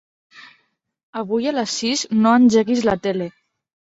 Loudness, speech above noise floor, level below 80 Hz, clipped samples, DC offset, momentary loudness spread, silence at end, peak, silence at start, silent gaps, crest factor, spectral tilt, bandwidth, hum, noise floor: -18 LUFS; 49 dB; -56 dBFS; under 0.1%; under 0.1%; 15 LU; 0.6 s; -2 dBFS; 0.35 s; 1.03-1.13 s; 18 dB; -4.5 dB/octave; 8 kHz; none; -66 dBFS